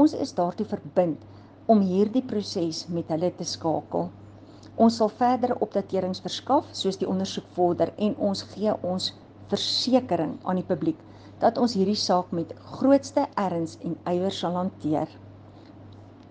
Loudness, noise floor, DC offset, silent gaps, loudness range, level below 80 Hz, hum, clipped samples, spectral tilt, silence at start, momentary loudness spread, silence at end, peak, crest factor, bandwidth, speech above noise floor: -26 LUFS; -47 dBFS; under 0.1%; none; 2 LU; -66 dBFS; none; under 0.1%; -6 dB/octave; 0 s; 9 LU; 0.2 s; -6 dBFS; 18 dB; 9.6 kHz; 22 dB